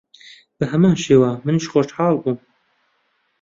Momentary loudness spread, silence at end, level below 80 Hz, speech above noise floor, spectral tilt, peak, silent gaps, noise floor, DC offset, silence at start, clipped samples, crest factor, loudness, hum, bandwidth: 11 LU; 1.05 s; -56 dBFS; 50 dB; -7 dB/octave; -2 dBFS; none; -66 dBFS; under 0.1%; 0.6 s; under 0.1%; 18 dB; -18 LUFS; none; 7.8 kHz